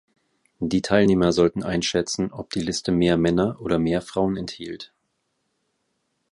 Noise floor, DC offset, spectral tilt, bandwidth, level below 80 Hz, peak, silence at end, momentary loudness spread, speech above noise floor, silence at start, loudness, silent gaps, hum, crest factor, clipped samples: -74 dBFS; under 0.1%; -5.5 dB/octave; 11.5 kHz; -48 dBFS; -2 dBFS; 1.5 s; 13 LU; 52 dB; 0.6 s; -22 LUFS; none; none; 20 dB; under 0.1%